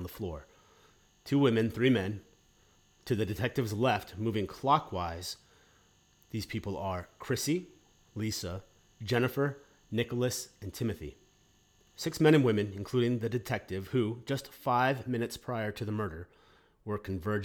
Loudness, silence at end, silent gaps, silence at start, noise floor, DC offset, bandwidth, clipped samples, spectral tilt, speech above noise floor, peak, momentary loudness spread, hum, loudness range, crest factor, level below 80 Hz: -32 LUFS; 0 s; none; 0 s; -66 dBFS; under 0.1%; 19.5 kHz; under 0.1%; -6 dB/octave; 35 dB; -12 dBFS; 15 LU; none; 5 LU; 20 dB; -58 dBFS